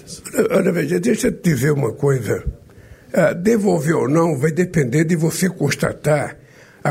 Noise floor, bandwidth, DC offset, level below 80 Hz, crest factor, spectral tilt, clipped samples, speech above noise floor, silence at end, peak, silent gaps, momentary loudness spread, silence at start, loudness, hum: -43 dBFS; 16 kHz; under 0.1%; -42 dBFS; 14 dB; -6 dB/octave; under 0.1%; 26 dB; 0 s; -4 dBFS; none; 7 LU; 0.05 s; -18 LUFS; none